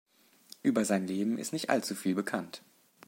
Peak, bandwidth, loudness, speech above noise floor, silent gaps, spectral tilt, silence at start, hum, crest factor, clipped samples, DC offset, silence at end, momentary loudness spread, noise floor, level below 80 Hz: -10 dBFS; 16.5 kHz; -32 LUFS; 26 dB; none; -4.5 dB/octave; 0.65 s; none; 22 dB; under 0.1%; under 0.1%; 0.5 s; 8 LU; -57 dBFS; -78 dBFS